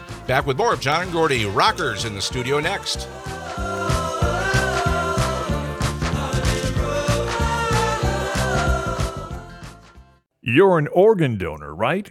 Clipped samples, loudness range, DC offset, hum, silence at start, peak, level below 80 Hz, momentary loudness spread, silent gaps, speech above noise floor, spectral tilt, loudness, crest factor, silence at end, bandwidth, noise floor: under 0.1%; 2 LU; under 0.1%; none; 0 s; -2 dBFS; -32 dBFS; 12 LU; none; 30 dB; -5 dB/octave; -21 LUFS; 18 dB; 0 s; 16 kHz; -50 dBFS